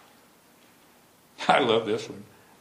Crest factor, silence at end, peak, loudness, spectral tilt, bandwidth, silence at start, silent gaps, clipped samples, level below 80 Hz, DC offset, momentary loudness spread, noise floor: 24 dB; 0.35 s; -4 dBFS; -24 LUFS; -4.5 dB/octave; 15.5 kHz; 1.4 s; none; under 0.1%; -74 dBFS; under 0.1%; 19 LU; -58 dBFS